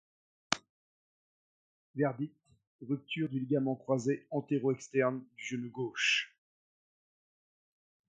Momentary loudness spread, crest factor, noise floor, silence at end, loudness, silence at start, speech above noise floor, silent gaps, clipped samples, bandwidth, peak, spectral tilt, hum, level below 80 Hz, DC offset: 11 LU; 32 dB; under -90 dBFS; 1.8 s; -34 LUFS; 0.5 s; over 56 dB; 0.69-1.94 s, 2.67-2.79 s; under 0.1%; 9.4 kHz; -4 dBFS; -4.5 dB/octave; none; -80 dBFS; under 0.1%